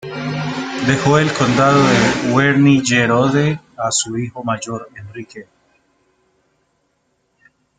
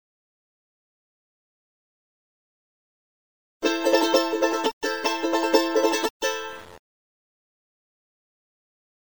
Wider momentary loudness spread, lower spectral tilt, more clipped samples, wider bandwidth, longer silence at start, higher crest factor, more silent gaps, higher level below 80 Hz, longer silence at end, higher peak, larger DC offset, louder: first, 17 LU vs 8 LU; first, -5 dB/octave vs -1.5 dB/octave; neither; second, 9.4 kHz vs over 20 kHz; second, 0.05 s vs 3.6 s; second, 16 dB vs 24 dB; second, none vs 4.73-4.81 s, 6.10-6.20 s; first, -50 dBFS vs -70 dBFS; about the same, 2.35 s vs 2.3 s; about the same, -2 dBFS vs -4 dBFS; second, under 0.1% vs 0.3%; first, -15 LUFS vs -23 LUFS